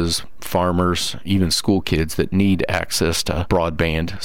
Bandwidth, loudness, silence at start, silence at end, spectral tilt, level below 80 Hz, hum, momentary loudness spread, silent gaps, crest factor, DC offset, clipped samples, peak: 17 kHz; -20 LUFS; 0 s; 0 s; -4.5 dB/octave; -34 dBFS; none; 4 LU; none; 14 dB; 3%; under 0.1%; -6 dBFS